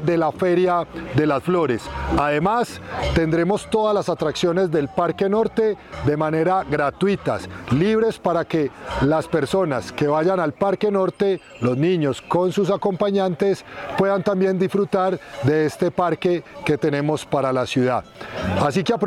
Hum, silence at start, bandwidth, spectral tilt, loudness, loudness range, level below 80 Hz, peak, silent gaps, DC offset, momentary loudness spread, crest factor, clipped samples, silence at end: none; 0 s; 13.5 kHz; -6.5 dB/octave; -21 LUFS; 1 LU; -42 dBFS; -6 dBFS; none; under 0.1%; 5 LU; 14 dB; under 0.1%; 0 s